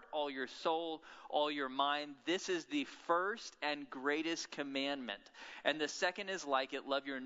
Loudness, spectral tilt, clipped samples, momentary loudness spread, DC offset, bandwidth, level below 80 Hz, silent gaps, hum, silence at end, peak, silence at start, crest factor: -38 LUFS; -0.5 dB/octave; under 0.1%; 5 LU; under 0.1%; 7.6 kHz; -82 dBFS; none; none; 0 s; -18 dBFS; 0 s; 22 dB